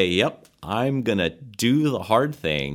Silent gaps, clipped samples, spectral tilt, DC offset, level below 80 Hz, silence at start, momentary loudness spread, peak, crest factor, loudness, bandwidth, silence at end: none; under 0.1%; -5.5 dB/octave; under 0.1%; -52 dBFS; 0 s; 6 LU; -4 dBFS; 18 dB; -23 LUFS; 17 kHz; 0 s